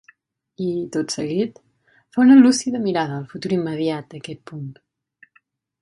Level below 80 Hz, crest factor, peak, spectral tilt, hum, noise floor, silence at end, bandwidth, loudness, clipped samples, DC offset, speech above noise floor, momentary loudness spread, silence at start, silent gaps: -66 dBFS; 20 dB; -2 dBFS; -5.5 dB/octave; none; -62 dBFS; 1.1 s; 11.5 kHz; -19 LUFS; under 0.1%; under 0.1%; 43 dB; 22 LU; 0.6 s; none